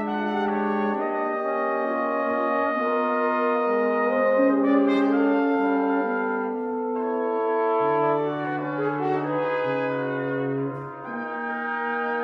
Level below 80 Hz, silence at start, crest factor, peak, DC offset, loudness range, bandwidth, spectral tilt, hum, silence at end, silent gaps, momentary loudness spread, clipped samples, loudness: -70 dBFS; 0 s; 14 dB; -10 dBFS; under 0.1%; 5 LU; 5.6 kHz; -8.5 dB/octave; none; 0 s; none; 7 LU; under 0.1%; -24 LUFS